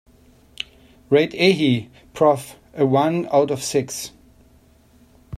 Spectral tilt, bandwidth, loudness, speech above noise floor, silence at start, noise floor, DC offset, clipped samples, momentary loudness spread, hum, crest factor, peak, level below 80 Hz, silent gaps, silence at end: -5 dB/octave; 15 kHz; -19 LUFS; 35 dB; 1.1 s; -53 dBFS; under 0.1%; under 0.1%; 17 LU; none; 18 dB; -4 dBFS; -54 dBFS; none; 0.05 s